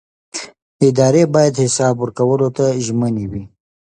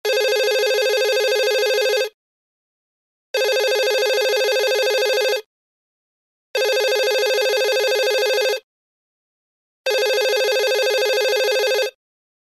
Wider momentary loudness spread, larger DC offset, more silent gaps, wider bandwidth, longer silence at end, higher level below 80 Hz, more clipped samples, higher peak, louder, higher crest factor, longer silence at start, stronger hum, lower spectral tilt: first, 16 LU vs 5 LU; neither; second, 0.62-0.79 s vs 2.14-3.34 s, 5.46-6.54 s, 8.63-9.85 s; second, 11 kHz vs 15.5 kHz; second, 0.35 s vs 0.7 s; first, -48 dBFS vs under -90 dBFS; neither; first, 0 dBFS vs -6 dBFS; first, -15 LUFS vs -18 LUFS; about the same, 16 dB vs 14 dB; first, 0.35 s vs 0.05 s; neither; first, -6 dB/octave vs 3 dB/octave